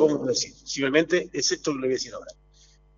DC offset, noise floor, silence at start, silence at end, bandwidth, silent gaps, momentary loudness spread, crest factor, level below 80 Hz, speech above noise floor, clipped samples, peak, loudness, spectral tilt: under 0.1%; -56 dBFS; 0 s; 0.65 s; 7.6 kHz; none; 8 LU; 20 dB; -58 dBFS; 31 dB; under 0.1%; -6 dBFS; -25 LUFS; -3 dB/octave